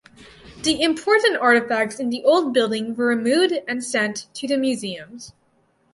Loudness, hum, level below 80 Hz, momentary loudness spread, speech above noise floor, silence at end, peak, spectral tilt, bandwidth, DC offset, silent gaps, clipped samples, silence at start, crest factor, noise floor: -20 LUFS; none; -60 dBFS; 11 LU; 43 dB; 0.65 s; -4 dBFS; -3 dB/octave; 11.5 kHz; under 0.1%; none; under 0.1%; 0.2 s; 18 dB; -63 dBFS